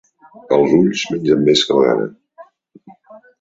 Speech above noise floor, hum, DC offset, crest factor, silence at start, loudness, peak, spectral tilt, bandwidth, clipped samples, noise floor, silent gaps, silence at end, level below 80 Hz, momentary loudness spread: 31 dB; none; under 0.1%; 16 dB; 0.5 s; -15 LUFS; -2 dBFS; -5 dB/octave; 7.8 kHz; under 0.1%; -45 dBFS; none; 0.2 s; -56 dBFS; 7 LU